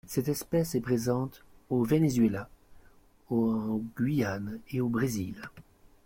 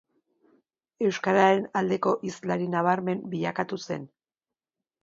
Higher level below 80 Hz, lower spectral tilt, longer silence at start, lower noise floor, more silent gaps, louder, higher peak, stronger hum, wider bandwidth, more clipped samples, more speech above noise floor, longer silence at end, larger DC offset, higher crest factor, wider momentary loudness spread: first, -58 dBFS vs -72 dBFS; about the same, -6.5 dB/octave vs -6 dB/octave; second, 0.05 s vs 1 s; second, -58 dBFS vs under -90 dBFS; neither; second, -30 LUFS vs -26 LUFS; second, -14 dBFS vs -8 dBFS; neither; first, 16.5 kHz vs 7.8 kHz; neither; second, 29 dB vs over 64 dB; second, 0.45 s vs 0.95 s; neither; about the same, 16 dB vs 20 dB; first, 13 LU vs 10 LU